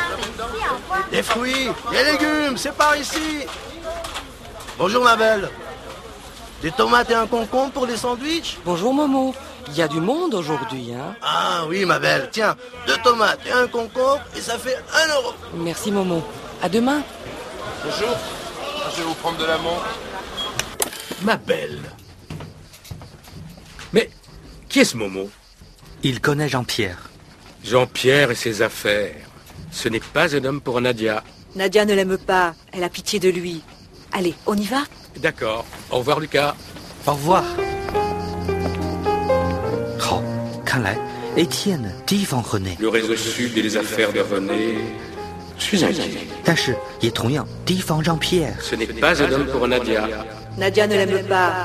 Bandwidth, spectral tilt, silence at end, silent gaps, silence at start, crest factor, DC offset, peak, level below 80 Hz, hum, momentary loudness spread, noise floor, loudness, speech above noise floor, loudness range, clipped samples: 14.5 kHz; -4 dB/octave; 0 s; none; 0 s; 20 dB; under 0.1%; 0 dBFS; -46 dBFS; none; 15 LU; -46 dBFS; -21 LUFS; 25 dB; 5 LU; under 0.1%